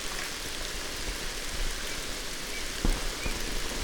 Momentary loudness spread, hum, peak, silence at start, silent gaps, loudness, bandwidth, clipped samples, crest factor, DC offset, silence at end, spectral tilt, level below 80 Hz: 3 LU; none; -10 dBFS; 0 s; none; -33 LUFS; over 20 kHz; under 0.1%; 22 dB; under 0.1%; 0 s; -2 dB/octave; -36 dBFS